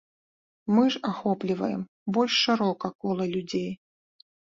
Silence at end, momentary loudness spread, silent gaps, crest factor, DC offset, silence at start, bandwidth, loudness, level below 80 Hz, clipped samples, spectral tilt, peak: 0.75 s; 11 LU; 1.88-2.06 s, 2.95-2.99 s; 18 dB; under 0.1%; 0.65 s; 7.6 kHz; -26 LUFS; -68 dBFS; under 0.1%; -5.5 dB/octave; -10 dBFS